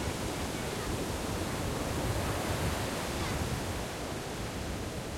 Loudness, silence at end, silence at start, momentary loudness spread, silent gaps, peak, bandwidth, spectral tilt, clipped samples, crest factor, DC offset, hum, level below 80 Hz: -35 LUFS; 0 s; 0 s; 5 LU; none; -20 dBFS; 16.5 kHz; -4.5 dB/octave; under 0.1%; 14 dB; under 0.1%; none; -44 dBFS